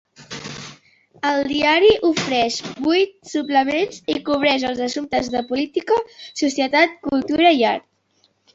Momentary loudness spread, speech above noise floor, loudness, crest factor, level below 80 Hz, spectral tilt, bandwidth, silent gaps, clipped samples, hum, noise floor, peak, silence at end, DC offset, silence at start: 15 LU; 44 dB; -19 LUFS; 18 dB; -54 dBFS; -3.5 dB/octave; 8 kHz; none; under 0.1%; none; -63 dBFS; -2 dBFS; 0.75 s; under 0.1%; 0.2 s